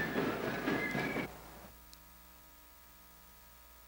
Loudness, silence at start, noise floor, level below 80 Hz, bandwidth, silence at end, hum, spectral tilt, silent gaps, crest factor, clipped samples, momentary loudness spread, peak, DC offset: -36 LUFS; 0 s; -58 dBFS; -62 dBFS; 17 kHz; 0 s; 60 Hz at -60 dBFS; -5 dB/octave; none; 18 dB; under 0.1%; 21 LU; -22 dBFS; under 0.1%